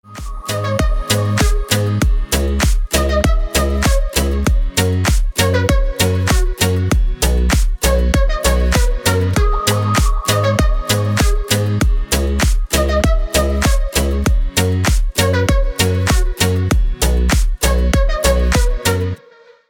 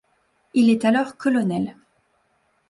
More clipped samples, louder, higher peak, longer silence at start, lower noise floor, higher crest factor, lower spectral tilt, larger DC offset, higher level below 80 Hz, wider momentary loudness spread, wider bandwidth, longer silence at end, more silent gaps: neither; first, -16 LUFS vs -21 LUFS; first, 0 dBFS vs -8 dBFS; second, 0.1 s vs 0.55 s; second, -45 dBFS vs -66 dBFS; about the same, 14 dB vs 14 dB; second, -4.5 dB/octave vs -6.5 dB/octave; neither; first, -16 dBFS vs -64 dBFS; second, 3 LU vs 9 LU; first, over 20 kHz vs 11.5 kHz; second, 0.55 s vs 1 s; neither